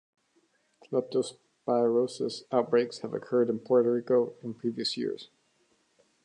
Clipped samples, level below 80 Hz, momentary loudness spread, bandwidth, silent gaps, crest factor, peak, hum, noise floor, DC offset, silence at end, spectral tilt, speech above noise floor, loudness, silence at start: under 0.1%; -82 dBFS; 10 LU; 10.5 kHz; none; 18 dB; -10 dBFS; none; -70 dBFS; under 0.1%; 1 s; -5.5 dB/octave; 42 dB; -29 LUFS; 0.9 s